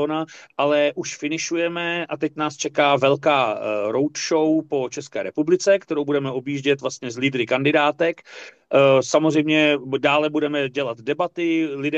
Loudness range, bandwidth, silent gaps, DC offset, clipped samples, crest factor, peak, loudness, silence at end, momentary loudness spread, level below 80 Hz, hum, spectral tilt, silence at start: 3 LU; 8.4 kHz; none; under 0.1%; under 0.1%; 16 dB; -4 dBFS; -21 LUFS; 0 s; 9 LU; -70 dBFS; none; -4.5 dB/octave; 0 s